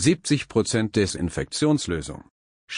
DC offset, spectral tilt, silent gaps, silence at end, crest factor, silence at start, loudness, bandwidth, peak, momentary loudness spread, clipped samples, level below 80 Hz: under 0.1%; -5 dB/octave; 2.30-2.68 s; 0 s; 16 dB; 0 s; -24 LUFS; 10.5 kHz; -8 dBFS; 8 LU; under 0.1%; -46 dBFS